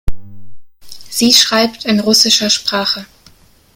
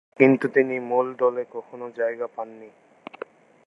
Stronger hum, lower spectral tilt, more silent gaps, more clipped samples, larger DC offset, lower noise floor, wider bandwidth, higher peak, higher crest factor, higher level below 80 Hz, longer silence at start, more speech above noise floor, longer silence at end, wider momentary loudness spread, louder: neither; second, -2 dB/octave vs -8.5 dB/octave; neither; neither; neither; first, -46 dBFS vs -42 dBFS; first, over 20 kHz vs 5.6 kHz; about the same, 0 dBFS vs -2 dBFS; second, 14 dB vs 22 dB; first, -32 dBFS vs -80 dBFS; second, 0.05 s vs 0.2 s; first, 34 dB vs 19 dB; second, 0.7 s vs 1 s; second, 12 LU vs 21 LU; first, -11 LUFS vs -23 LUFS